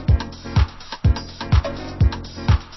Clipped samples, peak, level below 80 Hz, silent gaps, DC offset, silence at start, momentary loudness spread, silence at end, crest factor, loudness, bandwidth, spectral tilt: under 0.1%; -4 dBFS; -24 dBFS; none; under 0.1%; 0 s; 5 LU; 0 s; 14 dB; -22 LUFS; 6 kHz; -7 dB/octave